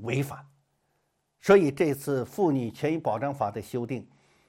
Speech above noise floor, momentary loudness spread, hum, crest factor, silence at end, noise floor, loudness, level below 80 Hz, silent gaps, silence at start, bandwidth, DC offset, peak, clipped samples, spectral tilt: 48 dB; 15 LU; none; 20 dB; 0.45 s; -75 dBFS; -27 LUFS; -64 dBFS; none; 0 s; 16.5 kHz; under 0.1%; -8 dBFS; under 0.1%; -7 dB/octave